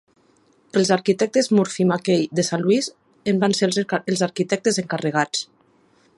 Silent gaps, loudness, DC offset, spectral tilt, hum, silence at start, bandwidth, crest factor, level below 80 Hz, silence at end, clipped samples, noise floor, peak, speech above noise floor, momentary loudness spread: none; -21 LUFS; under 0.1%; -4.5 dB/octave; none; 0.75 s; 11.5 kHz; 18 dB; -66 dBFS; 0.75 s; under 0.1%; -59 dBFS; -4 dBFS; 39 dB; 6 LU